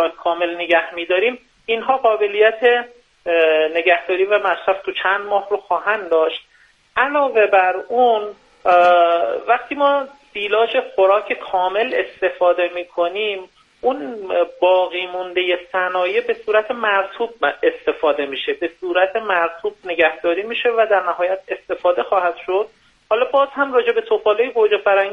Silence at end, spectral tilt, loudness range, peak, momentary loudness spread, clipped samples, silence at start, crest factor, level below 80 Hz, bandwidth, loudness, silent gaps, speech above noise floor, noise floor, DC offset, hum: 0 s; -4.5 dB/octave; 3 LU; 0 dBFS; 7 LU; under 0.1%; 0 s; 18 dB; -64 dBFS; 6.6 kHz; -18 LUFS; none; 26 dB; -44 dBFS; under 0.1%; none